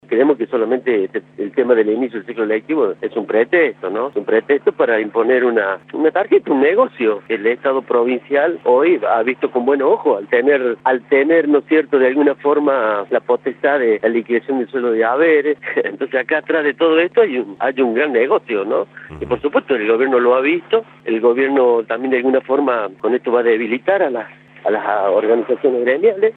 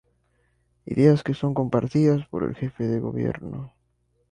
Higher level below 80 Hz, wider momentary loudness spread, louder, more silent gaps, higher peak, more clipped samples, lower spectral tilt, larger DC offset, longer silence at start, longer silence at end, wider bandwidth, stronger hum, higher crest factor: second, -60 dBFS vs -54 dBFS; second, 7 LU vs 15 LU; first, -16 LUFS vs -24 LUFS; neither; first, -2 dBFS vs -6 dBFS; neither; about the same, -8 dB/octave vs -9 dB/octave; neither; second, 0.1 s vs 0.9 s; second, 0.05 s vs 0.65 s; second, 4.1 kHz vs 9.8 kHz; neither; second, 14 dB vs 20 dB